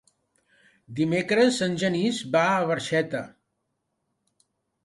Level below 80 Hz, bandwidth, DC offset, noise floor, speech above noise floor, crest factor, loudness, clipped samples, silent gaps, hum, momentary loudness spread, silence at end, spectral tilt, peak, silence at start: -66 dBFS; 11.5 kHz; under 0.1%; -78 dBFS; 54 dB; 18 dB; -24 LUFS; under 0.1%; none; none; 11 LU; 1.55 s; -5 dB/octave; -8 dBFS; 0.9 s